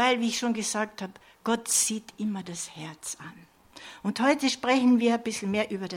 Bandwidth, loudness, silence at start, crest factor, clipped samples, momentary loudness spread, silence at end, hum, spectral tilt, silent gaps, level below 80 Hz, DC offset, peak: 16.5 kHz; -27 LUFS; 0 s; 18 dB; under 0.1%; 16 LU; 0 s; none; -3 dB/octave; none; -68 dBFS; under 0.1%; -10 dBFS